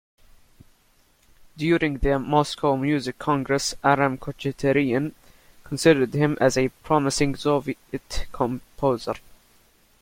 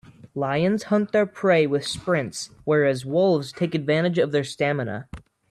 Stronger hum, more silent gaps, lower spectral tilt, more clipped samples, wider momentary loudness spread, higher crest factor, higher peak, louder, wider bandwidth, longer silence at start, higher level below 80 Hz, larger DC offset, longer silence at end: neither; neither; about the same, -5.5 dB/octave vs -6 dB/octave; neither; about the same, 12 LU vs 11 LU; first, 22 dB vs 14 dB; first, -2 dBFS vs -8 dBFS; about the same, -23 LUFS vs -23 LUFS; first, 16.5 kHz vs 13 kHz; first, 1.55 s vs 0.25 s; first, -42 dBFS vs -56 dBFS; neither; first, 0.85 s vs 0.3 s